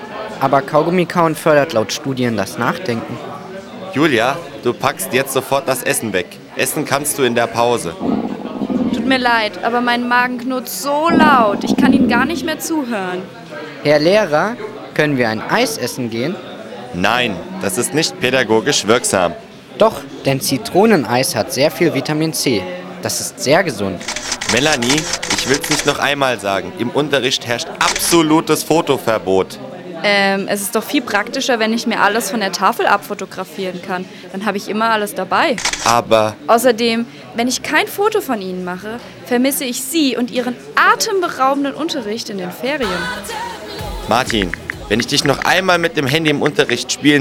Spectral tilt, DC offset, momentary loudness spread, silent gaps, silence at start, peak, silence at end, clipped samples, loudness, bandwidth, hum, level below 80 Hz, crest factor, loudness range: -3.5 dB/octave; under 0.1%; 11 LU; none; 0 s; 0 dBFS; 0 s; under 0.1%; -16 LUFS; 18.5 kHz; none; -46 dBFS; 16 dB; 3 LU